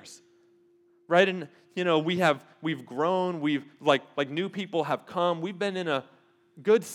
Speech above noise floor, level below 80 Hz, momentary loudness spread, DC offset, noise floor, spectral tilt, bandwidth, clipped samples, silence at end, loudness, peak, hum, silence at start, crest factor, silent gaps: 36 dB; -88 dBFS; 9 LU; under 0.1%; -63 dBFS; -5.5 dB/octave; 15 kHz; under 0.1%; 0 s; -28 LUFS; -6 dBFS; none; 0.05 s; 22 dB; none